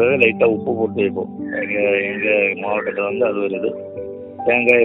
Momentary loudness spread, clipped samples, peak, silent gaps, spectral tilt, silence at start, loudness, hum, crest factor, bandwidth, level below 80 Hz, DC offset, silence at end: 12 LU; under 0.1%; 0 dBFS; none; -8 dB/octave; 0 s; -18 LUFS; none; 18 dB; 4 kHz; -62 dBFS; under 0.1%; 0 s